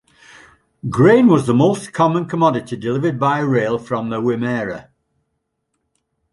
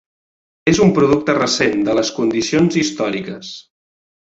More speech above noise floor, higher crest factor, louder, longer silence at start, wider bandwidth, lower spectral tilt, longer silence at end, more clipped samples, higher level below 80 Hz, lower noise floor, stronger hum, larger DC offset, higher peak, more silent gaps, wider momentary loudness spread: second, 57 dB vs over 74 dB; about the same, 16 dB vs 16 dB; about the same, -17 LUFS vs -16 LUFS; first, 0.85 s vs 0.65 s; first, 11.5 kHz vs 8 kHz; first, -7.5 dB/octave vs -5 dB/octave; first, 1.5 s vs 0.6 s; neither; second, -54 dBFS vs -48 dBFS; second, -73 dBFS vs under -90 dBFS; neither; neither; about the same, -2 dBFS vs -2 dBFS; neither; second, 11 LU vs 15 LU